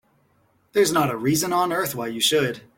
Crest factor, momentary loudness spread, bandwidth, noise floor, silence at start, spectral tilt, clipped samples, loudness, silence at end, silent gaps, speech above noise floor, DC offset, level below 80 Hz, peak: 16 dB; 5 LU; 17 kHz; -63 dBFS; 0.75 s; -3.5 dB/octave; under 0.1%; -21 LUFS; 0.2 s; none; 41 dB; under 0.1%; -60 dBFS; -6 dBFS